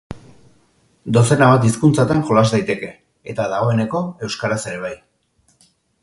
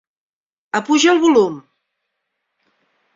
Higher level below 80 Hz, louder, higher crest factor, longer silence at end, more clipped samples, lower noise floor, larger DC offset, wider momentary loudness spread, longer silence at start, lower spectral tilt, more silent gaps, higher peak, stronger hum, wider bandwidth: first, -50 dBFS vs -64 dBFS; about the same, -17 LUFS vs -15 LUFS; about the same, 18 dB vs 18 dB; second, 1.1 s vs 1.55 s; neither; second, -61 dBFS vs -75 dBFS; neither; first, 22 LU vs 12 LU; second, 0.1 s vs 0.75 s; first, -6 dB/octave vs -3 dB/octave; neither; about the same, 0 dBFS vs -2 dBFS; neither; first, 11.5 kHz vs 7.8 kHz